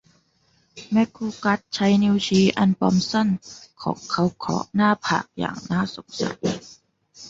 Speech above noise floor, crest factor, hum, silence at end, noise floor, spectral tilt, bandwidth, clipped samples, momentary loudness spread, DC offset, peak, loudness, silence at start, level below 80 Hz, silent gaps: 42 dB; 20 dB; none; 0 s; -64 dBFS; -5.5 dB/octave; 7.8 kHz; under 0.1%; 11 LU; under 0.1%; -4 dBFS; -22 LUFS; 0.75 s; -56 dBFS; none